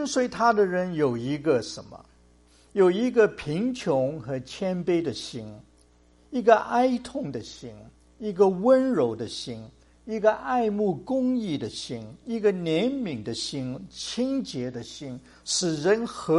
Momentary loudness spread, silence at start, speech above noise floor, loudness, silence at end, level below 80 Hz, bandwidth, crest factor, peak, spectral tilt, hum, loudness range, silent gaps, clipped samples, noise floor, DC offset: 16 LU; 0 s; 33 dB; -26 LUFS; 0 s; -58 dBFS; 11.5 kHz; 22 dB; -4 dBFS; -5 dB/octave; none; 4 LU; none; under 0.1%; -59 dBFS; under 0.1%